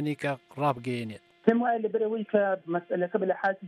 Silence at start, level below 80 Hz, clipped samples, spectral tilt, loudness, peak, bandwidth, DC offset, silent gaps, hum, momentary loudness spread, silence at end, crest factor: 0 s; -76 dBFS; under 0.1%; -7.5 dB/octave; -28 LUFS; -8 dBFS; 12.5 kHz; under 0.1%; none; none; 7 LU; 0 s; 20 dB